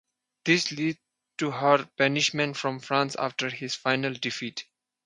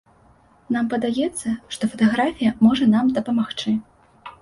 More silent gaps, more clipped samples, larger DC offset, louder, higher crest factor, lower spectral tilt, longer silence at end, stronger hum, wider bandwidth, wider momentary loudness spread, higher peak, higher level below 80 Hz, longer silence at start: neither; neither; neither; second, -26 LUFS vs -21 LUFS; first, 22 dB vs 16 dB; second, -4 dB/octave vs -5.5 dB/octave; first, 0.45 s vs 0.1 s; neither; about the same, 11 kHz vs 11.5 kHz; about the same, 11 LU vs 10 LU; about the same, -6 dBFS vs -6 dBFS; second, -74 dBFS vs -54 dBFS; second, 0.45 s vs 0.7 s